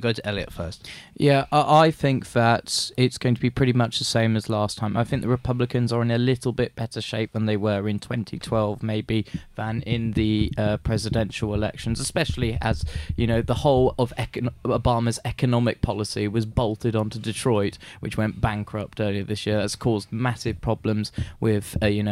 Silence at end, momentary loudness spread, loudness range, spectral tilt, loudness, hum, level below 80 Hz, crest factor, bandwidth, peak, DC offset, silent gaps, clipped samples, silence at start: 0 s; 8 LU; 5 LU; -6 dB/octave; -24 LUFS; none; -40 dBFS; 18 dB; 14 kHz; -6 dBFS; under 0.1%; none; under 0.1%; 0 s